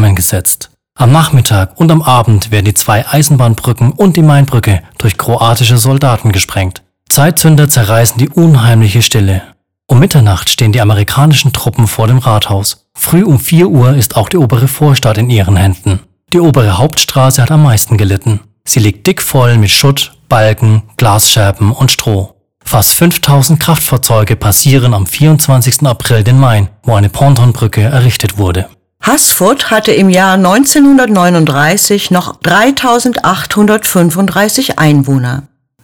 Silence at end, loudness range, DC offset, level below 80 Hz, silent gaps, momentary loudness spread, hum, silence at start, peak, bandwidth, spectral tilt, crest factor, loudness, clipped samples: 0.4 s; 2 LU; 1%; -34 dBFS; none; 6 LU; none; 0 s; 0 dBFS; over 20 kHz; -5 dB/octave; 8 dB; -8 LUFS; 2%